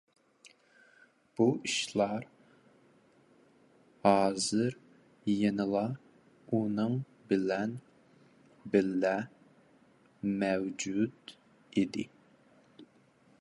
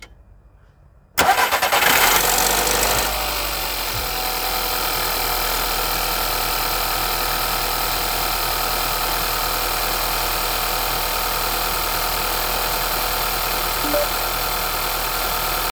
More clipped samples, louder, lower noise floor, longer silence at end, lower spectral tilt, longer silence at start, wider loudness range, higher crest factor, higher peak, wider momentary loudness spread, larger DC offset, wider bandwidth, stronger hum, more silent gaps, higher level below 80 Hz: neither; second, -32 LUFS vs -19 LUFS; first, -65 dBFS vs -50 dBFS; first, 0.55 s vs 0 s; first, -5 dB/octave vs -1 dB/octave; first, 0.45 s vs 0 s; about the same, 4 LU vs 3 LU; about the same, 24 dB vs 20 dB; second, -10 dBFS vs 0 dBFS; first, 18 LU vs 5 LU; neither; second, 11.5 kHz vs over 20 kHz; neither; neither; second, -72 dBFS vs -34 dBFS